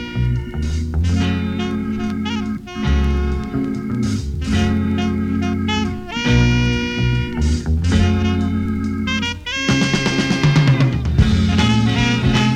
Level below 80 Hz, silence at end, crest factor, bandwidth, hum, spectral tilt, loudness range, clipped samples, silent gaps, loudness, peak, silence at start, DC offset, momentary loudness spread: -26 dBFS; 0 s; 16 dB; 10.5 kHz; none; -6 dB/octave; 4 LU; under 0.1%; none; -18 LUFS; 0 dBFS; 0 s; under 0.1%; 7 LU